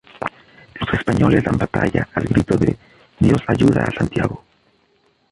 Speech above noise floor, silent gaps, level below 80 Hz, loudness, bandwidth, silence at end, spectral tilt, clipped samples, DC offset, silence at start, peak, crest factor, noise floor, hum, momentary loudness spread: 43 dB; none; -36 dBFS; -18 LUFS; 11.5 kHz; 0.95 s; -7.5 dB/octave; under 0.1%; under 0.1%; 0.15 s; -2 dBFS; 16 dB; -60 dBFS; none; 14 LU